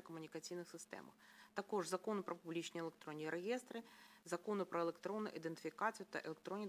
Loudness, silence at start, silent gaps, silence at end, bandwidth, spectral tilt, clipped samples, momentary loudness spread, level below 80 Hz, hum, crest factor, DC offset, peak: -46 LUFS; 0 s; none; 0 s; 16 kHz; -4.5 dB/octave; under 0.1%; 11 LU; under -90 dBFS; none; 20 dB; under 0.1%; -26 dBFS